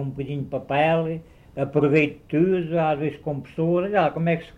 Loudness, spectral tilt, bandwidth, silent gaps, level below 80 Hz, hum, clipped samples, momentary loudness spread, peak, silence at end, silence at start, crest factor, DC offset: -23 LUFS; -9 dB/octave; 7.2 kHz; none; -54 dBFS; none; under 0.1%; 10 LU; -6 dBFS; 0.05 s; 0 s; 16 dB; under 0.1%